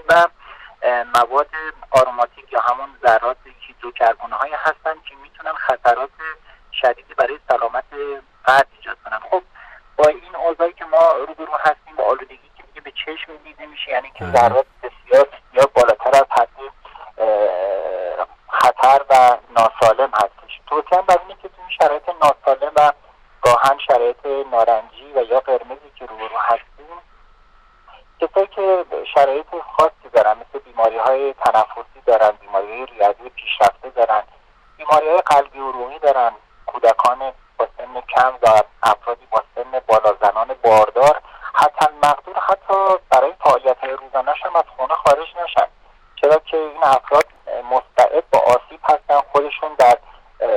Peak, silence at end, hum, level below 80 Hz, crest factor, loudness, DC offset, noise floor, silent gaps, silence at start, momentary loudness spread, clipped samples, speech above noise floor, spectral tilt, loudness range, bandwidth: -4 dBFS; 0 s; none; -52 dBFS; 14 dB; -17 LUFS; under 0.1%; -50 dBFS; none; 0.1 s; 14 LU; under 0.1%; 33 dB; -3.5 dB/octave; 6 LU; 15.5 kHz